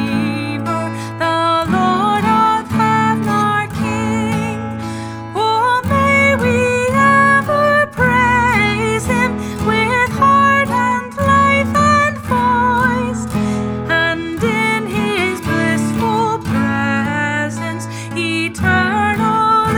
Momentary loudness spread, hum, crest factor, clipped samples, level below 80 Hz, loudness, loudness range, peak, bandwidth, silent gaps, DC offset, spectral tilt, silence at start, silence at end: 8 LU; none; 14 dB; under 0.1%; -40 dBFS; -15 LUFS; 4 LU; 0 dBFS; 17 kHz; none; under 0.1%; -5.5 dB/octave; 0 s; 0 s